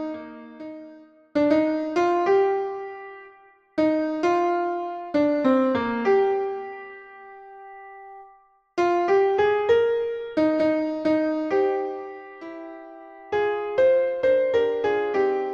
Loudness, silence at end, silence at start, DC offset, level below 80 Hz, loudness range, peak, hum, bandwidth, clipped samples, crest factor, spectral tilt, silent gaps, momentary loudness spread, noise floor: -23 LUFS; 0 s; 0 s; under 0.1%; -62 dBFS; 4 LU; -8 dBFS; none; 7.2 kHz; under 0.1%; 16 dB; -6 dB/octave; none; 21 LU; -56 dBFS